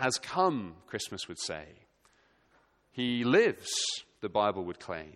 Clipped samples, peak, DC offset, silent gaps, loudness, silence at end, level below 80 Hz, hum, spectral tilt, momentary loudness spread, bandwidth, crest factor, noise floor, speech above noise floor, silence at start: under 0.1%; -12 dBFS; under 0.1%; none; -31 LUFS; 0.05 s; -68 dBFS; none; -3.5 dB/octave; 13 LU; 14 kHz; 20 dB; -68 dBFS; 37 dB; 0 s